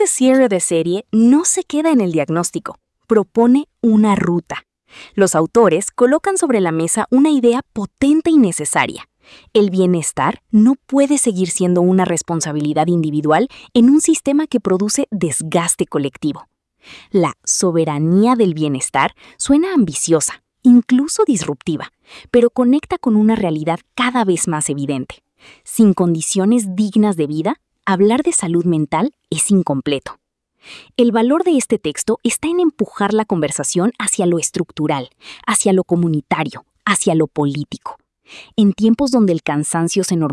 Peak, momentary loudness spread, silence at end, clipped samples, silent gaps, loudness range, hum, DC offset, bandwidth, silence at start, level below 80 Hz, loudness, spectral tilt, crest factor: -2 dBFS; 9 LU; 0 s; under 0.1%; none; 3 LU; none; under 0.1%; 12 kHz; 0 s; -54 dBFS; -16 LUFS; -5 dB/octave; 14 dB